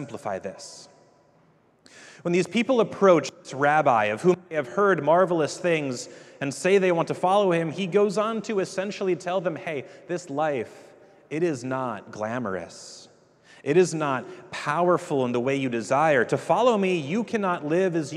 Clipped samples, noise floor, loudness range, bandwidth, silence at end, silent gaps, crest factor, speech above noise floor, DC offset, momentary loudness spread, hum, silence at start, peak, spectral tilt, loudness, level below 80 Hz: under 0.1%; -61 dBFS; 8 LU; 12 kHz; 0 s; none; 20 dB; 36 dB; under 0.1%; 13 LU; none; 0 s; -4 dBFS; -5.5 dB/octave; -24 LUFS; -74 dBFS